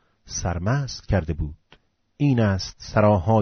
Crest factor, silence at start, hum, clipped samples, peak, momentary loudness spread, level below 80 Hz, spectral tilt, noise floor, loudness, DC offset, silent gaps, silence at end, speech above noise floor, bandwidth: 16 dB; 0.25 s; none; under 0.1%; -6 dBFS; 11 LU; -38 dBFS; -6.5 dB/octave; -58 dBFS; -23 LUFS; under 0.1%; none; 0 s; 37 dB; 6.6 kHz